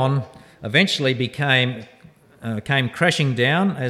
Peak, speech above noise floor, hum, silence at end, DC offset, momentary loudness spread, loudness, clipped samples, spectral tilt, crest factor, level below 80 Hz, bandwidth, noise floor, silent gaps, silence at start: -2 dBFS; 30 dB; none; 0 s; under 0.1%; 16 LU; -20 LUFS; under 0.1%; -5 dB/octave; 18 dB; -60 dBFS; 13.5 kHz; -50 dBFS; none; 0 s